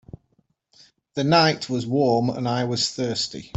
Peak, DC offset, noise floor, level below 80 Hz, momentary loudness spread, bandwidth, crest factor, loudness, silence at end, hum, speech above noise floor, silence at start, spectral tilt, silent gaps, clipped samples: -4 dBFS; under 0.1%; -67 dBFS; -60 dBFS; 9 LU; 8.4 kHz; 20 dB; -22 LUFS; 0.1 s; none; 45 dB; 1.15 s; -5 dB/octave; none; under 0.1%